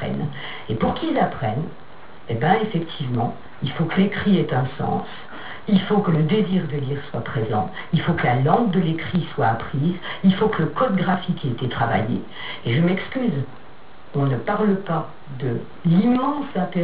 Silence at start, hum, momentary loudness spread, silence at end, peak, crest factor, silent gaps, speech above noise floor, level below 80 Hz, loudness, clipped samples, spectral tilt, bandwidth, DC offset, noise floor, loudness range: 0 s; none; 11 LU; 0 s; -2 dBFS; 20 dB; none; 25 dB; -52 dBFS; -22 LUFS; under 0.1%; -6 dB/octave; 4.9 kHz; 2%; -46 dBFS; 3 LU